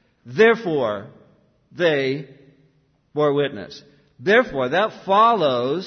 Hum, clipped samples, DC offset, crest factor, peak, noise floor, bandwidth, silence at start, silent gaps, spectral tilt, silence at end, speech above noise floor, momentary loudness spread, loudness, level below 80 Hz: none; under 0.1%; under 0.1%; 18 dB; -4 dBFS; -61 dBFS; 6.6 kHz; 0.25 s; none; -6 dB/octave; 0 s; 42 dB; 15 LU; -19 LUFS; -60 dBFS